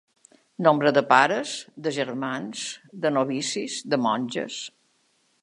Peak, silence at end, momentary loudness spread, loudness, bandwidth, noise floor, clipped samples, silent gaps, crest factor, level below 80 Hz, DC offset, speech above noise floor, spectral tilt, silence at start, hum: -2 dBFS; 0.75 s; 14 LU; -24 LUFS; 11.5 kHz; -67 dBFS; under 0.1%; none; 24 dB; -78 dBFS; under 0.1%; 43 dB; -4 dB/octave; 0.6 s; none